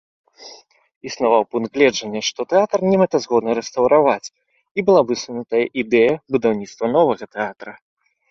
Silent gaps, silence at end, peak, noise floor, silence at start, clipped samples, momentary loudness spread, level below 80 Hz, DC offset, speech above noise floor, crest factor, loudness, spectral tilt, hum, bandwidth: 0.96-1.01 s, 4.71-4.75 s; 0.6 s; -2 dBFS; -45 dBFS; 0.4 s; under 0.1%; 11 LU; -60 dBFS; under 0.1%; 27 dB; 18 dB; -18 LUFS; -5 dB/octave; none; 7.6 kHz